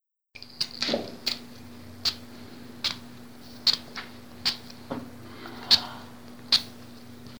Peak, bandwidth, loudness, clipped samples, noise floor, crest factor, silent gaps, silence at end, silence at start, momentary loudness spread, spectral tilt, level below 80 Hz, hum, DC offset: -4 dBFS; over 20 kHz; -27 LUFS; under 0.1%; -50 dBFS; 28 dB; none; 0 s; 0 s; 24 LU; -2 dB/octave; -64 dBFS; none; 0.3%